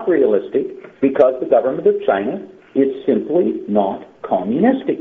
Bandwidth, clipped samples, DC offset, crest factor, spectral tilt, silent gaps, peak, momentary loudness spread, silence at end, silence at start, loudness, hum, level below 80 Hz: 4 kHz; under 0.1%; under 0.1%; 16 dB; -6.5 dB/octave; none; 0 dBFS; 9 LU; 0 s; 0 s; -17 LUFS; none; -60 dBFS